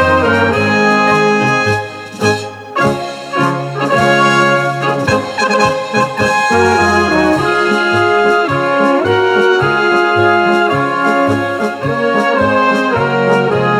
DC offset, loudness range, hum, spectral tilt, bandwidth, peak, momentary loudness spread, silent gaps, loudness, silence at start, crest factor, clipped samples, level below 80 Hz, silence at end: under 0.1%; 2 LU; none; -5 dB/octave; 15 kHz; 0 dBFS; 5 LU; none; -12 LUFS; 0 s; 12 dB; under 0.1%; -44 dBFS; 0 s